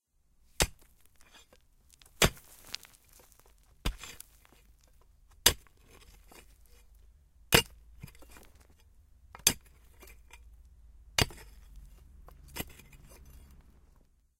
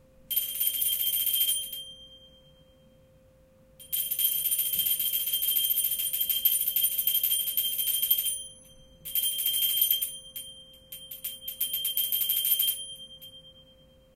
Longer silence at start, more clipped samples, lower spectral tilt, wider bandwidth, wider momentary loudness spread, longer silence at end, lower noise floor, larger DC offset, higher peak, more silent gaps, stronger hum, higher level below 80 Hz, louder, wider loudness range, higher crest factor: first, 0.6 s vs 0.3 s; neither; first, -2 dB/octave vs 2 dB/octave; about the same, 16.5 kHz vs 17 kHz; first, 29 LU vs 17 LU; first, 1.8 s vs 0.55 s; first, -67 dBFS vs -59 dBFS; neither; first, -2 dBFS vs -8 dBFS; neither; neither; first, -50 dBFS vs -64 dBFS; second, -30 LUFS vs -25 LUFS; about the same, 7 LU vs 5 LU; first, 36 dB vs 22 dB